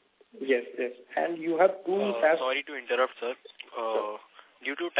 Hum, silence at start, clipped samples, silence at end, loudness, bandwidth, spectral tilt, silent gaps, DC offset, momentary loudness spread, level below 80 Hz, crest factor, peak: none; 0.35 s; under 0.1%; 0 s; -29 LUFS; 4 kHz; -8 dB/octave; none; under 0.1%; 13 LU; -86 dBFS; 20 dB; -8 dBFS